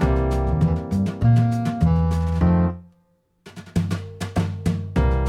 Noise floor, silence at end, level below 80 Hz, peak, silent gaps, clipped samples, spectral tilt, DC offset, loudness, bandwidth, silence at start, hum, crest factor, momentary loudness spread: -63 dBFS; 0 s; -28 dBFS; -6 dBFS; none; under 0.1%; -8.5 dB/octave; under 0.1%; -22 LUFS; 12 kHz; 0 s; none; 14 dB; 9 LU